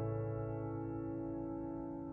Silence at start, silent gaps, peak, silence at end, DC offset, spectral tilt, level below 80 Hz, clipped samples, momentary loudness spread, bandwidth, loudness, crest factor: 0 s; none; -30 dBFS; 0 s; under 0.1%; -13 dB/octave; -58 dBFS; under 0.1%; 3 LU; 2.9 kHz; -42 LUFS; 12 dB